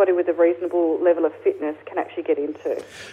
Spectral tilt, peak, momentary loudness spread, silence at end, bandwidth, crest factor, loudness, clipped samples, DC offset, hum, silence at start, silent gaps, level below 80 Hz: -6 dB/octave; -6 dBFS; 9 LU; 0 s; 9.8 kHz; 14 dB; -22 LUFS; under 0.1%; under 0.1%; none; 0 s; none; -72 dBFS